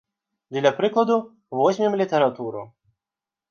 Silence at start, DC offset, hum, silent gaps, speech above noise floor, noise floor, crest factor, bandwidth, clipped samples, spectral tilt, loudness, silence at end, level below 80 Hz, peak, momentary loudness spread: 0.5 s; under 0.1%; none; none; 68 dB; -90 dBFS; 18 dB; 7 kHz; under 0.1%; -6 dB/octave; -22 LUFS; 0.85 s; -76 dBFS; -6 dBFS; 12 LU